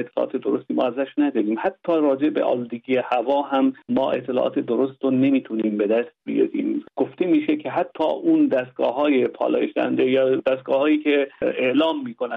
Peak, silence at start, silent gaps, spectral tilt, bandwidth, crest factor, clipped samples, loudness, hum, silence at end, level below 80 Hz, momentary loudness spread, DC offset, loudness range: -8 dBFS; 0 s; none; -8.5 dB/octave; 4.5 kHz; 14 dB; under 0.1%; -22 LUFS; none; 0 s; -68 dBFS; 6 LU; under 0.1%; 2 LU